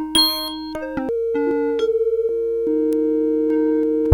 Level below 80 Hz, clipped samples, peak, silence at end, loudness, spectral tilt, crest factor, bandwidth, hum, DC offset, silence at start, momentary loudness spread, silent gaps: -48 dBFS; under 0.1%; -2 dBFS; 0 s; -20 LUFS; -4.5 dB/octave; 18 dB; 17.5 kHz; none; under 0.1%; 0 s; 7 LU; none